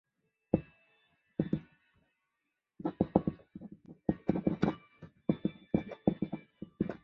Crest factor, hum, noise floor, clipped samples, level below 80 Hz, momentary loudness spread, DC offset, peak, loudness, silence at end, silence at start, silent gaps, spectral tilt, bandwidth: 28 dB; none; -85 dBFS; under 0.1%; -58 dBFS; 17 LU; under 0.1%; -8 dBFS; -36 LUFS; 0.05 s; 0.55 s; none; -8.5 dB/octave; 6 kHz